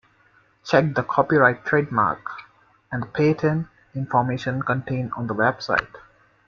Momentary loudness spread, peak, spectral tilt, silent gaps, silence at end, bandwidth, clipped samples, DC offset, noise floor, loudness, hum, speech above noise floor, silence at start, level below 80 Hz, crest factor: 14 LU; -2 dBFS; -7.5 dB/octave; none; 0.5 s; 7.2 kHz; under 0.1%; under 0.1%; -59 dBFS; -22 LUFS; none; 37 dB; 0.65 s; -56 dBFS; 22 dB